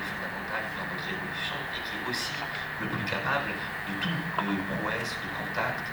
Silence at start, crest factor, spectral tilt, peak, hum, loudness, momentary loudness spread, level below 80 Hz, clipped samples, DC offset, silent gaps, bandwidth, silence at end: 0 s; 20 dB; -4.5 dB/octave; -12 dBFS; none; -31 LUFS; 4 LU; -56 dBFS; under 0.1%; under 0.1%; none; over 20 kHz; 0 s